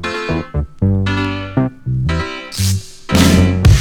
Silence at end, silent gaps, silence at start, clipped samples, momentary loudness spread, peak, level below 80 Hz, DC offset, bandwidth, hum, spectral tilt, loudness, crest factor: 0 s; none; 0 s; under 0.1%; 10 LU; 0 dBFS; -24 dBFS; under 0.1%; 18.5 kHz; none; -5.5 dB/octave; -16 LUFS; 14 dB